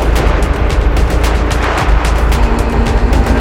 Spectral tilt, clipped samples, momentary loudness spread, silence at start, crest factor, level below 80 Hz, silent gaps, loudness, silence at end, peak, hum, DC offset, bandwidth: -6 dB/octave; under 0.1%; 1 LU; 0 s; 10 dB; -12 dBFS; none; -13 LUFS; 0 s; 0 dBFS; none; under 0.1%; 14.5 kHz